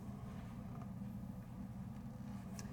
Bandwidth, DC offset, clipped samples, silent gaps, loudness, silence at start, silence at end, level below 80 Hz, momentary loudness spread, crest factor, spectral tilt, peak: 18 kHz; under 0.1%; under 0.1%; none; -50 LUFS; 0 s; 0 s; -60 dBFS; 2 LU; 20 dB; -7 dB/octave; -28 dBFS